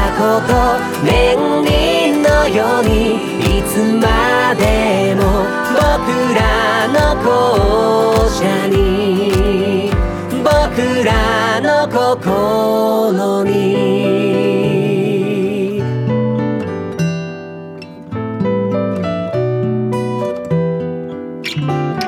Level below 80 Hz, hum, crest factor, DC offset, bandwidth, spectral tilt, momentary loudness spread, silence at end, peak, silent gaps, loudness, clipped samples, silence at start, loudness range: -26 dBFS; none; 12 dB; under 0.1%; over 20 kHz; -6 dB/octave; 7 LU; 0 s; -2 dBFS; none; -14 LUFS; under 0.1%; 0 s; 6 LU